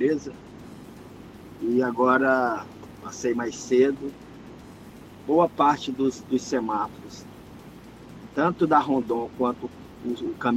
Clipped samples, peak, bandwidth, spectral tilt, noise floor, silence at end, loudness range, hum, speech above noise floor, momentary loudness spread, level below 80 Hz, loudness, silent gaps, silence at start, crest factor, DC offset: under 0.1%; -6 dBFS; 14.5 kHz; -5.5 dB/octave; -45 dBFS; 0 s; 2 LU; none; 21 dB; 24 LU; -58 dBFS; -24 LUFS; none; 0 s; 20 dB; under 0.1%